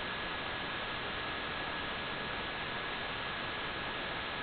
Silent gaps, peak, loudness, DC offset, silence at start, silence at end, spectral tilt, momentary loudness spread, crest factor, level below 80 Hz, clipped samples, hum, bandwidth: none; -26 dBFS; -37 LUFS; under 0.1%; 0 s; 0 s; -1 dB/octave; 0 LU; 12 dB; -56 dBFS; under 0.1%; none; 4.9 kHz